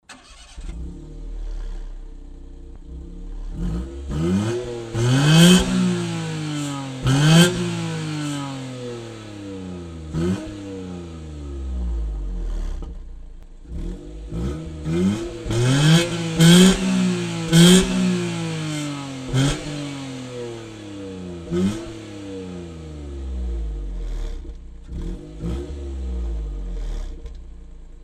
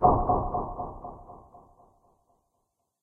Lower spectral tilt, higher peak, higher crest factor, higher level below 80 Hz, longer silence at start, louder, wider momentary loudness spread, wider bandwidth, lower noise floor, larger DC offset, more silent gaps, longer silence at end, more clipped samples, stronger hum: second, -5 dB/octave vs -13 dB/octave; first, 0 dBFS vs -6 dBFS; about the same, 22 dB vs 24 dB; first, -32 dBFS vs -40 dBFS; about the same, 0.1 s vs 0 s; first, -20 LUFS vs -28 LUFS; about the same, 23 LU vs 25 LU; first, 15 kHz vs 2.1 kHz; second, -44 dBFS vs -78 dBFS; neither; neither; second, 0 s vs 1.45 s; neither; neither